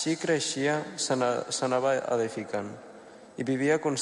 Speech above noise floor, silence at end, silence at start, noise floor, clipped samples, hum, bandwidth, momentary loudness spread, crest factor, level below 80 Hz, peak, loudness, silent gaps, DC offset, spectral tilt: 21 dB; 0 s; 0 s; -49 dBFS; under 0.1%; none; 11.5 kHz; 12 LU; 16 dB; -72 dBFS; -14 dBFS; -28 LUFS; none; under 0.1%; -4 dB/octave